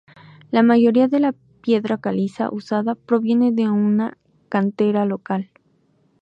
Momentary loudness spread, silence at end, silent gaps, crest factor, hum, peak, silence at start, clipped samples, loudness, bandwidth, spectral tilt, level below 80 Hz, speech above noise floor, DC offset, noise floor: 11 LU; 0.75 s; none; 14 dB; none; -4 dBFS; 0.5 s; under 0.1%; -20 LUFS; 6 kHz; -8.5 dB/octave; -68 dBFS; 43 dB; under 0.1%; -61 dBFS